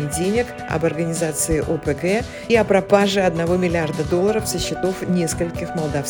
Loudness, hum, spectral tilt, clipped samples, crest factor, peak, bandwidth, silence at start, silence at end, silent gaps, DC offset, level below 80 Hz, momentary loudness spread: -20 LUFS; none; -5 dB/octave; under 0.1%; 18 dB; -2 dBFS; 18 kHz; 0 s; 0 s; none; under 0.1%; -40 dBFS; 7 LU